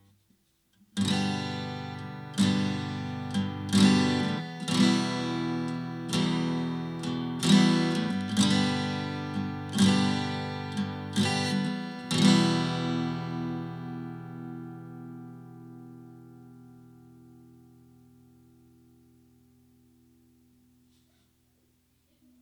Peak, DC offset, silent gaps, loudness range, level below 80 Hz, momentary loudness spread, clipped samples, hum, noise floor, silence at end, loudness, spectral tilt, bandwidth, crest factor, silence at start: -8 dBFS; under 0.1%; none; 15 LU; -68 dBFS; 19 LU; under 0.1%; none; -69 dBFS; 5.6 s; -28 LUFS; -5 dB/octave; 13 kHz; 20 dB; 0.95 s